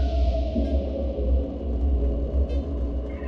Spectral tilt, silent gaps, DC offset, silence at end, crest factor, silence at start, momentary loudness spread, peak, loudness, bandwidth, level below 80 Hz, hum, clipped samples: -10 dB/octave; none; under 0.1%; 0 s; 12 dB; 0 s; 4 LU; -12 dBFS; -27 LUFS; 5.4 kHz; -24 dBFS; none; under 0.1%